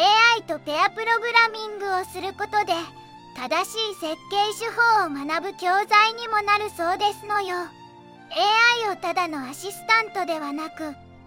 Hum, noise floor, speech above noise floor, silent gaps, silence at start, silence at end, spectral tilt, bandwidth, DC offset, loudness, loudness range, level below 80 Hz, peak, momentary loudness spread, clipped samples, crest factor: none; -46 dBFS; 23 dB; none; 0 s; 0.1 s; -2 dB/octave; 16.5 kHz; under 0.1%; -22 LUFS; 3 LU; -68 dBFS; -2 dBFS; 14 LU; under 0.1%; 22 dB